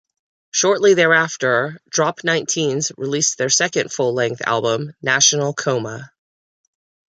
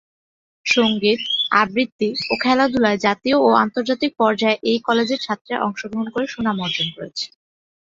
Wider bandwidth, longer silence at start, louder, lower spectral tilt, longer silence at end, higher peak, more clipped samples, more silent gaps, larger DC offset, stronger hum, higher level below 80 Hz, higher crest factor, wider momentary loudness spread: first, 10 kHz vs 7.6 kHz; about the same, 0.55 s vs 0.65 s; about the same, -17 LUFS vs -19 LUFS; second, -2.5 dB/octave vs -4.5 dB/octave; first, 1.1 s vs 0.55 s; about the same, 0 dBFS vs -2 dBFS; neither; second, none vs 1.92-1.99 s, 5.41-5.45 s; neither; neither; second, -66 dBFS vs -60 dBFS; about the same, 18 dB vs 18 dB; about the same, 9 LU vs 9 LU